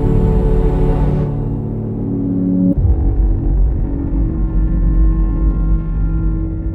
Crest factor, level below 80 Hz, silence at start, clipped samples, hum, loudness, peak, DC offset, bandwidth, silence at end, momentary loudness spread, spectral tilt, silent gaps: 12 dB; -16 dBFS; 0 s; under 0.1%; none; -17 LUFS; -2 dBFS; under 0.1%; 2.9 kHz; 0 s; 5 LU; -11.5 dB/octave; none